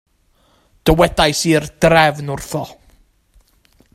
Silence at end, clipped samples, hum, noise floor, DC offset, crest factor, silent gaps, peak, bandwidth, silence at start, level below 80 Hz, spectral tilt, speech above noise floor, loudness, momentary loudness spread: 1.2 s; under 0.1%; none; -57 dBFS; under 0.1%; 18 dB; none; 0 dBFS; 16 kHz; 0.85 s; -34 dBFS; -4.5 dB/octave; 43 dB; -15 LUFS; 14 LU